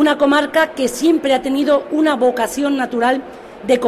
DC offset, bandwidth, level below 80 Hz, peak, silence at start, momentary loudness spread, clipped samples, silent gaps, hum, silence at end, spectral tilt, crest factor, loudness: under 0.1%; 15 kHz; -54 dBFS; -2 dBFS; 0 s; 5 LU; under 0.1%; none; none; 0 s; -3.5 dB/octave; 12 dB; -16 LUFS